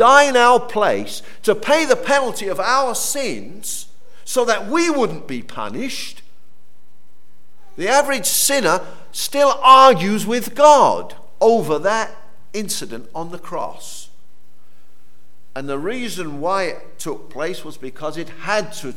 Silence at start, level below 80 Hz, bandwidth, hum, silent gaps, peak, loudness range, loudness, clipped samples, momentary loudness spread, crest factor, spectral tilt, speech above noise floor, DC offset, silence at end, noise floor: 0 s; -62 dBFS; 18 kHz; none; none; 0 dBFS; 14 LU; -17 LUFS; under 0.1%; 19 LU; 18 dB; -2.5 dB/octave; 43 dB; 5%; 0.05 s; -60 dBFS